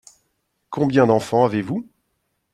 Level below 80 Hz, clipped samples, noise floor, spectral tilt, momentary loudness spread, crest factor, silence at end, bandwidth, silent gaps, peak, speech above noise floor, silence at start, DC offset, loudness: -60 dBFS; under 0.1%; -72 dBFS; -7 dB/octave; 12 LU; 20 dB; 0.7 s; 13.5 kHz; none; -2 dBFS; 54 dB; 0.7 s; under 0.1%; -19 LUFS